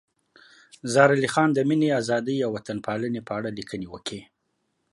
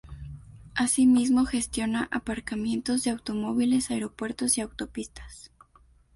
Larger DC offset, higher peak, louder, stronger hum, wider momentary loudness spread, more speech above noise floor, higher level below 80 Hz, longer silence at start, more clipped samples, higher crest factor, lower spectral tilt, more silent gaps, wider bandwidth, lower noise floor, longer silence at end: neither; first, -4 dBFS vs -12 dBFS; about the same, -24 LUFS vs -26 LUFS; neither; second, 16 LU vs 22 LU; first, 51 dB vs 33 dB; second, -64 dBFS vs -50 dBFS; first, 0.85 s vs 0.05 s; neither; first, 22 dB vs 16 dB; first, -5.5 dB/octave vs -3.5 dB/octave; neither; about the same, 11.5 kHz vs 11.5 kHz; first, -75 dBFS vs -59 dBFS; about the same, 0.7 s vs 0.7 s